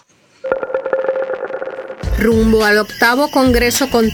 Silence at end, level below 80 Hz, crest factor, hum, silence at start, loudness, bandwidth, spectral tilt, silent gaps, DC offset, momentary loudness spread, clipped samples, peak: 0 s; -28 dBFS; 14 dB; none; 0.45 s; -15 LUFS; over 20 kHz; -4.5 dB/octave; none; under 0.1%; 13 LU; under 0.1%; 0 dBFS